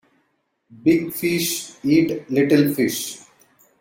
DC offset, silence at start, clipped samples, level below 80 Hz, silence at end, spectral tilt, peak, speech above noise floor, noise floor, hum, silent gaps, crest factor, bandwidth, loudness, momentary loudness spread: under 0.1%; 0.7 s; under 0.1%; -60 dBFS; 0.65 s; -5 dB/octave; -4 dBFS; 50 dB; -69 dBFS; none; none; 16 dB; 17 kHz; -20 LUFS; 9 LU